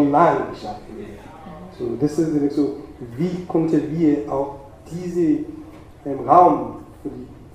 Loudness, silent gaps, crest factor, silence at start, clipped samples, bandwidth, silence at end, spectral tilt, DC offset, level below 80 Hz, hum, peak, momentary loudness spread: -20 LUFS; none; 20 dB; 0 s; under 0.1%; 10.5 kHz; 0.05 s; -8 dB/octave; under 0.1%; -48 dBFS; none; 0 dBFS; 22 LU